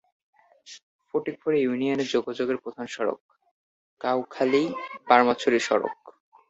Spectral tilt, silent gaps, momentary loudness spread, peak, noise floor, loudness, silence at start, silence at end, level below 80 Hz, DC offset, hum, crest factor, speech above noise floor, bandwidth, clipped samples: -4.5 dB/octave; 0.83-0.99 s, 3.20-3.29 s, 3.51-3.97 s; 16 LU; -4 dBFS; -50 dBFS; -25 LUFS; 0.65 s; 0.4 s; -70 dBFS; under 0.1%; none; 24 dB; 25 dB; 8 kHz; under 0.1%